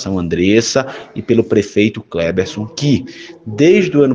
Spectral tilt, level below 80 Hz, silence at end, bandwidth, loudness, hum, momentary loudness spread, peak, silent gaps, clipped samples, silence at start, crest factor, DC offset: -5.5 dB/octave; -46 dBFS; 0 s; 9.6 kHz; -14 LUFS; none; 15 LU; 0 dBFS; none; under 0.1%; 0 s; 14 dB; under 0.1%